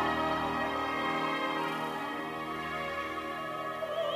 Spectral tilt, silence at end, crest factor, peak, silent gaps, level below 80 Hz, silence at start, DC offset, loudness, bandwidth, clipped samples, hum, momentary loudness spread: -4.5 dB/octave; 0 s; 14 dB; -20 dBFS; none; -60 dBFS; 0 s; under 0.1%; -33 LUFS; 16 kHz; under 0.1%; none; 5 LU